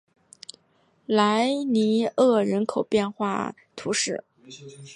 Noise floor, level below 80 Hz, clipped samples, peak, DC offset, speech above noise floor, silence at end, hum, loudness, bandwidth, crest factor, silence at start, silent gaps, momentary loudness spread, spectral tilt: -64 dBFS; -66 dBFS; under 0.1%; -6 dBFS; under 0.1%; 41 dB; 0 s; none; -24 LUFS; 11.5 kHz; 18 dB; 1.1 s; none; 23 LU; -4.5 dB/octave